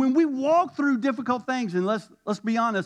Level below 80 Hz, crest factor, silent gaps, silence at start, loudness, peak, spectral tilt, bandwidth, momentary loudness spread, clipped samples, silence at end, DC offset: -80 dBFS; 14 dB; none; 0 s; -25 LUFS; -10 dBFS; -6 dB/octave; 9.6 kHz; 7 LU; under 0.1%; 0 s; under 0.1%